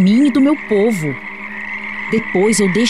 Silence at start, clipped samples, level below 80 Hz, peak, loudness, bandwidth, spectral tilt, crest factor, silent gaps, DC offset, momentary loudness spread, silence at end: 0 s; under 0.1%; -50 dBFS; -4 dBFS; -16 LUFS; 14 kHz; -5 dB/octave; 10 dB; none; 0.9%; 13 LU; 0 s